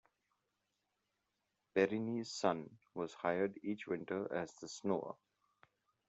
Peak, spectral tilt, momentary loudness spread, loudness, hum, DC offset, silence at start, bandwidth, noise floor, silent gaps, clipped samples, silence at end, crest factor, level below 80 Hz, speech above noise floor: -18 dBFS; -5.5 dB/octave; 10 LU; -40 LUFS; none; under 0.1%; 1.75 s; 8.2 kHz; -86 dBFS; none; under 0.1%; 0.95 s; 24 dB; -84 dBFS; 47 dB